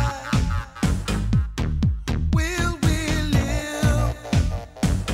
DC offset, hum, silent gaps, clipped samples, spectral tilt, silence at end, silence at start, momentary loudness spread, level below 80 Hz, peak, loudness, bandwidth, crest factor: under 0.1%; none; none; under 0.1%; -5.5 dB/octave; 0 s; 0 s; 4 LU; -26 dBFS; -6 dBFS; -23 LUFS; 16 kHz; 16 dB